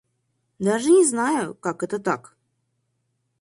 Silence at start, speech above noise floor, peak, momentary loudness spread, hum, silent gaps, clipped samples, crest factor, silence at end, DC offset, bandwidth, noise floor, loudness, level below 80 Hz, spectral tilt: 0.6 s; 52 dB; -6 dBFS; 12 LU; none; none; under 0.1%; 18 dB; 1.2 s; under 0.1%; 11.5 kHz; -73 dBFS; -22 LUFS; -68 dBFS; -4.5 dB/octave